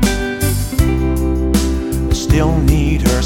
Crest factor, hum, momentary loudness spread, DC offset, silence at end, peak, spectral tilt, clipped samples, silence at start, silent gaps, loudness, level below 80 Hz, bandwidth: 14 dB; none; 4 LU; under 0.1%; 0 s; 0 dBFS; -5.5 dB/octave; under 0.1%; 0 s; none; -16 LUFS; -18 dBFS; 17 kHz